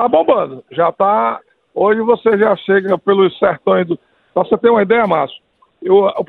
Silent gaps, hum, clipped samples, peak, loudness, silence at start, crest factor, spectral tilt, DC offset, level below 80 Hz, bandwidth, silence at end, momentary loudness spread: none; none; under 0.1%; 0 dBFS; -14 LUFS; 0 s; 14 dB; -9 dB/octave; under 0.1%; -58 dBFS; 4.2 kHz; 0.05 s; 10 LU